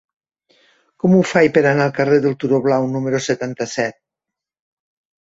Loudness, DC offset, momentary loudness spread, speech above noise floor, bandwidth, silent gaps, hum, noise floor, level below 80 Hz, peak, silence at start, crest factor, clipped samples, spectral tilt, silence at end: -17 LUFS; under 0.1%; 9 LU; 69 dB; 8 kHz; none; none; -85 dBFS; -60 dBFS; -2 dBFS; 1.05 s; 16 dB; under 0.1%; -6 dB/octave; 1.3 s